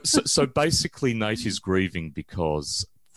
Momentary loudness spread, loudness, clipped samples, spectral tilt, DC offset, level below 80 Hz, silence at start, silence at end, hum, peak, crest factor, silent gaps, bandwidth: 9 LU; -25 LUFS; under 0.1%; -3.5 dB/octave; 0.1%; -46 dBFS; 0.05 s; 0.3 s; none; -6 dBFS; 18 dB; none; 13 kHz